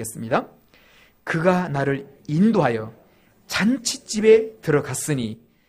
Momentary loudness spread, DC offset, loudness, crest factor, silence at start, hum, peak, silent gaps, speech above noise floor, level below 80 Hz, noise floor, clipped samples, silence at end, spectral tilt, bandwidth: 12 LU; under 0.1%; -21 LUFS; 18 dB; 0 s; none; -4 dBFS; none; 33 dB; -56 dBFS; -54 dBFS; under 0.1%; 0.35 s; -5 dB/octave; 15.5 kHz